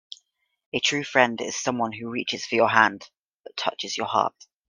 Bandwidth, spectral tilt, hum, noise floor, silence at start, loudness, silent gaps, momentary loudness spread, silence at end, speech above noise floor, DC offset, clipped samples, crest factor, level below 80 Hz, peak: 10.5 kHz; -2.5 dB/octave; none; -64 dBFS; 0.75 s; -24 LUFS; 3.17-3.38 s; 13 LU; 0.4 s; 40 dB; under 0.1%; under 0.1%; 24 dB; -70 dBFS; 0 dBFS